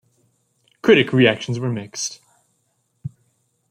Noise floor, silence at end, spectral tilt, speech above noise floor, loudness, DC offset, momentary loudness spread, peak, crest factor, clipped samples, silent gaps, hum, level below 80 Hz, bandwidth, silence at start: -68 dBFS; 0.65 s; -5 dB/octave; 51 dB; -18 LUFS; under 0.1%; 22 LU; 0 dBFS; 20 dB; under 0.1%; none; none; -62 dBFS; 14.5 kHz; 0.85 s